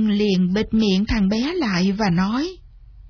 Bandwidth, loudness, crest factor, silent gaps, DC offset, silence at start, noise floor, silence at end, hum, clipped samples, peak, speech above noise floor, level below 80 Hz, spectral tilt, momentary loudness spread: 5.4 kHz; -20 LUFS; 12 dB; none; under 0.1%; 0 s; -43 dBFS; 0 s; none; under 0.1%; -8 dBFS; 24 dB; -38 dBFS; -6.5 dB/octave; 3 LU